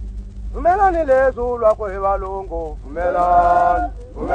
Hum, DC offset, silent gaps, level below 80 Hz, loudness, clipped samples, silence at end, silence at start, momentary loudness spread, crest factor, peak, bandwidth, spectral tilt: 50 Hz at -35 dBFS; under 0.1%; none; -30 dBFS; -17 LUFS; under 0.1%; 0 s; 0 s; 14 LU; 16 dB; -2 dBFS; 9.2 kHz; -7.5 dB/octave